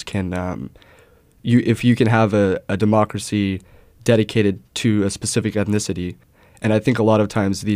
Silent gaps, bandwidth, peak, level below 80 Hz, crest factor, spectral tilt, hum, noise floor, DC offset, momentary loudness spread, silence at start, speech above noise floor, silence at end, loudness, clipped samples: none; 15.5 kHz; -4 dBFS; -50 dBFS; 16 dB; -6 dB/octave; none; -52 dBFS; under 0.1%; 11 LU; 0 s; 33 dB; 0 s; -19 LUFS; under 0.1%